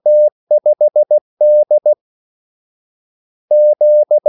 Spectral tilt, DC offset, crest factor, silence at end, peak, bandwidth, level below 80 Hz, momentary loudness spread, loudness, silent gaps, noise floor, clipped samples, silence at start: -10.5 dB/octave; under 0.1%; 8 dB; 0 s; -4 dBFS; 0.9 kHz; -84 dBFS; 5 LU; -12 LUFS; 0.32-0.47 s, 1.21-1.37 s, 2.01-3.48 s; under -90 dBFS; under 0.1%; 0.05 s